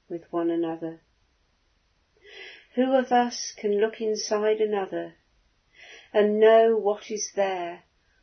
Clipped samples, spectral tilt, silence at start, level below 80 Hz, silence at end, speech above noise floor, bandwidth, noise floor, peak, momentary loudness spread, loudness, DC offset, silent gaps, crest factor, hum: under 0.1%; -4 dB/octave; 0.1 s; -72 dBFS; 0.45 s; 44 dB; 6.6 kHz; -68 dBFS; -8 dBFS; 18 LU; -24 LUFS; under 0.1%; none; 18 dB; none